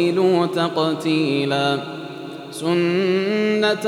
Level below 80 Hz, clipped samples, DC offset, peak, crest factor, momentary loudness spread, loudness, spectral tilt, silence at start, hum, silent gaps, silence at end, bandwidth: -76 dBFS; under 0.1%; under 0.1%; -6 dBFS; 14 dB; 14 LU; -20 LUFS; -6 dB/octave; 0 s; none; none; 0 s; 13 kHz